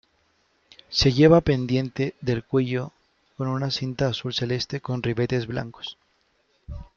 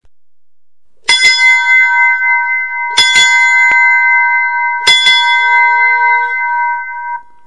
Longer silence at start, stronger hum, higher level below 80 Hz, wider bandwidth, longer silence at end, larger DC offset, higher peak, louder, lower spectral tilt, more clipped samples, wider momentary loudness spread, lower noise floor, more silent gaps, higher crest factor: second, 0.9 s vs 1.1 s; neither; first, -46 dBFS vs -56 dBFS; second, 7.2 kHz vs 12 kHz; second, 0.1 s vs 0.25 s; second, under 0.1% vs 2%; second, -4 dBFS vs 0 dBFS; second, -24 LUFS vs -7 LUFS; first, -6.5 dB/octave vs 2.5 dB/octave; second, under 0.1% vs 0.3%; first, 18 LU vs 9 LU; second, -67 dBFS vs -86 dBFS; neither; first, 22 dB vs 10 dB